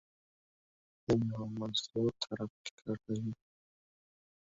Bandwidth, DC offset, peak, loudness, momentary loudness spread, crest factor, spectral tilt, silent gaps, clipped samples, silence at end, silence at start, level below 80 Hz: 7.6 kHz; under 0.1%; -18 dBFS; -37 LUFS; 11 LU; 22 dB; -6 dB/octave; 2.50-2.65 s, 2.71-2.78 s; under 0.1%; 1.05 s; 1.1 s; -66 dBFS